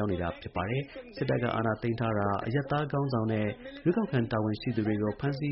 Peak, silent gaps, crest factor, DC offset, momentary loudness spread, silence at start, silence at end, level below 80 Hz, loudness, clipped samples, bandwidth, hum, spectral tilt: -16 dBFS; none; 14 dB; under 0.1%; 5 LU; 0 s; 0 s; -54 dBFS; -31 LUFS; under 0.1%; 5.8 kHz; none; -6.5 dB/octave